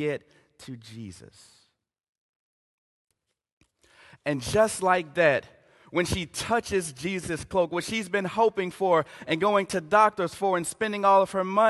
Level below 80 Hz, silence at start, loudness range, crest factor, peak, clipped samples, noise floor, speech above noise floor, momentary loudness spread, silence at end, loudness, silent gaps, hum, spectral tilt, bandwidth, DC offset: -54 dBFS; 0 s; 7 LU; 20 dB; -6 dBFS; under 0.1%; -71 dBFS; 45 dB; 14 LU; 0 s; -25 LUFS; 2.09-3.08 s, 3.52-3.61 s; none; -4.5 dB/octave; 12.5 kHz; under 0.1%